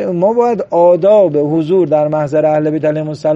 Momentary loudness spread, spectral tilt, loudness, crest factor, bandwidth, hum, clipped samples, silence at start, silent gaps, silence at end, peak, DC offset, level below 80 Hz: 6 LU; -9 dB/octave; -12 LUFS; 10 dB; 7.8 kHz; none; under 0.1%; 0 s; none; 0 s; 0 dBFS; under 0.1%; -58 dBFS